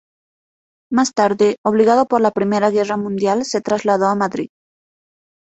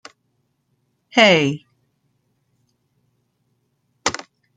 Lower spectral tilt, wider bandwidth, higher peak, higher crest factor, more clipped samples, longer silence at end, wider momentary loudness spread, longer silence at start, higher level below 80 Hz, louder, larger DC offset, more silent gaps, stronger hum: first, -5 dB/octave vs -3.5 dB/octave; second, 8.2 kHz vs 9.6 kHz; about the same, -2 dBFS vs -2 dBFS; second, 16 dB vs 22 dB; neither; first, 1.05 s vs 0.45 s; second, 7 LU vs 19 LU; second, 0.9 s vs 1.15 s; about the same, -60 dBFS vs -64 dBFS; about the same, -17 LUFS vs -17 LUFS; neither; first, 1.58-1.64 s vs none; second, none vs 60 Hz at -60 dBFS